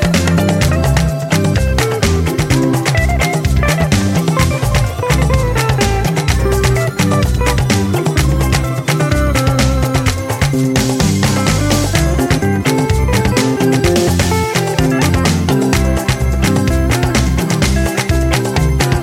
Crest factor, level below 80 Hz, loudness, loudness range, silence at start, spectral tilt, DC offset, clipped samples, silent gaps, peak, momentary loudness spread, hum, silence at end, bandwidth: 12 dB; -20 dBFS; -14 LUFS; 1 LU; 0 s; -5.5 dB/octave; under 0.1%; under 0.1%; none; 0 dBFS; 2 LU; none; 0 s; 16.5 kHz